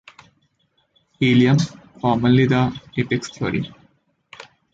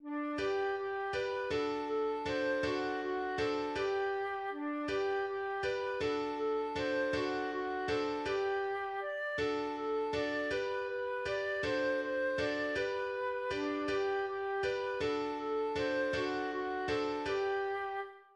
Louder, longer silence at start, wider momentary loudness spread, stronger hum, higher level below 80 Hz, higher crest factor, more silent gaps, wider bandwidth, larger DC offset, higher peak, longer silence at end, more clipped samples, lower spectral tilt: first, -19 LUFS vs -35 LUFS; first, 1.2 s vs 0 s; first, 11 LU vs 3 LU; neither; first, -52 dBFS vs -62 dBFS; about the same, 16 dB vs 12 dB; neither; second, 7.8 kHz vs 10 kHz; neither; first, -4 dBFS vs -22 dBFS; first, 0.3 s vs 0.15 s; neither; first, -6.5 dB/octave vs -5 dB/octave